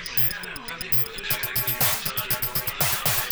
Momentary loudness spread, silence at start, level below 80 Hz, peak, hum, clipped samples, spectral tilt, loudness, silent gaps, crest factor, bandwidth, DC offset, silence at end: 5 LU; 0 s; -48 dBFS; -10 dBFS; none; under 0.1%; -2 dB/octave; -23 LUFS; none; 16 dB; over 20 kHz; 0.1%; 0 s